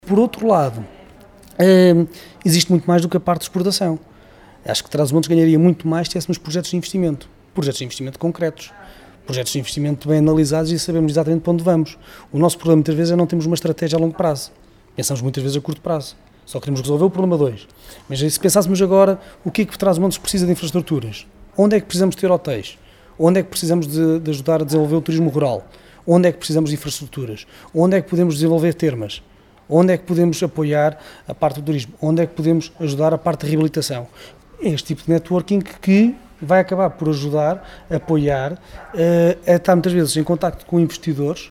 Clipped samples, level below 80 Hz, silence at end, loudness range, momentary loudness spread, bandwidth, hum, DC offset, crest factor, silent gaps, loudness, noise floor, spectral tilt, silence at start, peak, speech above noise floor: under 0.1%; -48 dBFS; 0.05 s; 4 LU; 13 LU; 16 kHz; none; under 0.1%; 18 dB; none; -18 LUFS; -45 dBFS; -6 dB/octave; 0.05 s; 0 dBFS; 28 dB